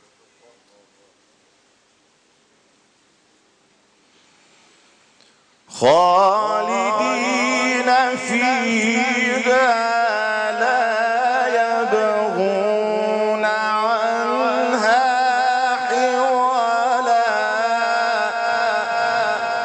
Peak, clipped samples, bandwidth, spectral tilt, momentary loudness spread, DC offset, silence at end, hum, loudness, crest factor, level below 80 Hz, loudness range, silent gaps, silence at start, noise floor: -4 dBFS; under 0.1%; 9.8 kHz; -3 dB/octave; 4 LU; under 0.1%; 0 s; none; -18 LUFS; 14 dB; -70 dBFS; 2 LU; none; 5.7 s; -59 dBFS